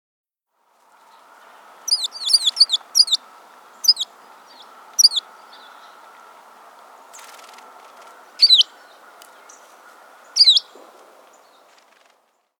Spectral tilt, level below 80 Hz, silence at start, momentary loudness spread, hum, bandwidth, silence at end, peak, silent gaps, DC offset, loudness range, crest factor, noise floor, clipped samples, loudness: 5 dB/octave; under -90 dBFS; 1.85 s; 13 LU; none; over 20 kHz; 2 s; 0 dBFS; none; under 0.1%; 5 LU; 22 dB; -67 dBFS; under 0.1%; -15 LUFS